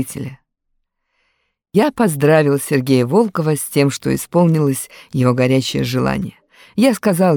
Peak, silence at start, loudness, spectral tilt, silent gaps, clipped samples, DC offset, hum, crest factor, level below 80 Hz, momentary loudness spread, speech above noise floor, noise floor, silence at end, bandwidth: -2 dBFS; 0 s; -16 LUFS; -6 dB/octave; none; under 0.1%; under 0.1%; none; 16 dB; -50 dBFS; 11 LU; 54 dB; -70 dBFS; 0 s; 19 kHz